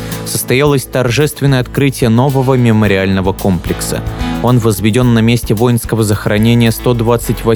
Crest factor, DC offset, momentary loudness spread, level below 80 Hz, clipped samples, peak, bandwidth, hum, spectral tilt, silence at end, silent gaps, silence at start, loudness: 12 dB; under 0.1%; 6 LU; -28 dBFS; under 0.1%; 0 dBFS; over 20 kHz; none; -6 dB/octave; 0 s; none; 0 s; -12 LUFS